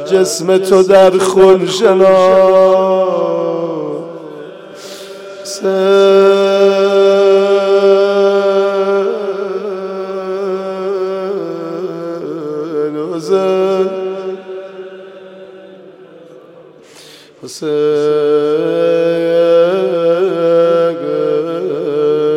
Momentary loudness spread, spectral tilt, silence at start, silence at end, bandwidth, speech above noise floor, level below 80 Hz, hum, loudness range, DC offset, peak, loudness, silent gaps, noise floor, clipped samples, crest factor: 17 LU; -5 dB/octave; 0 s; 0 s; 13 kHz; 30 dB; -58 dBFS; none; 10 LU; under 0.1%; 0 dBFS; -12 LUFS; none; -39 dBFS; under 0.1%; 12 dB